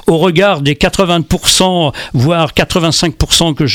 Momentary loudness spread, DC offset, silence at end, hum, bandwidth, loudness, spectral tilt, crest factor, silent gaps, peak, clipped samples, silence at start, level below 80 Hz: 4 LU; under 0.1%; 0 s; none; 19 kHz; -11 LUFS; -4 dB/octave; 10 dB; none; 0 dBFS; under 0.1%; 0.05 s; -28 dBFS